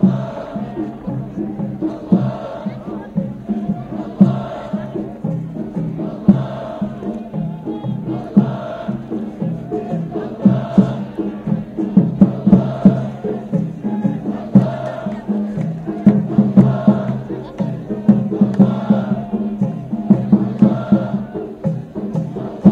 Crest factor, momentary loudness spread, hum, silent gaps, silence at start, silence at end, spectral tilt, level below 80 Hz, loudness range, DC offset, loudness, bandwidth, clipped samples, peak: 18 dB; 12 LU; none; none; 0 s; 0 s; -10.5 dB/octave; -46 dBFS; 6 LU; under 0.1%; -18 LUFS; 4.5 kHz; under 0.1%; 0 dBFS